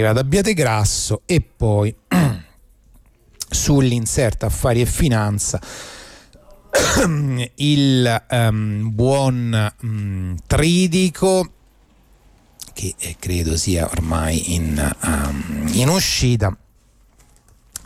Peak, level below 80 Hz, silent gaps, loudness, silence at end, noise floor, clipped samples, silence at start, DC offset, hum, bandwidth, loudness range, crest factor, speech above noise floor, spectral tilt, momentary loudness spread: -4 dBFS; -32 dBFS; none; -18 LUFS; 0.1 s; -53 dBFS; under 0.1%; 0 s; under 0.1%; none; 16 kHz; 3 LU; 14 dB; 36 dB; -5 dB/octave; 11 LU